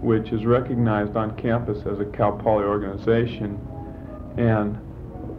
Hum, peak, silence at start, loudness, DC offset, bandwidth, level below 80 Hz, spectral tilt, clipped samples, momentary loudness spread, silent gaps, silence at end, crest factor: none; -6 dBFS; 0 s; -23 LUFS; under 0.1%; 5 kHz; -42 dBFS; -10 dB/octave; under 0.1%; 15 LU; none; 0 s; 18 dB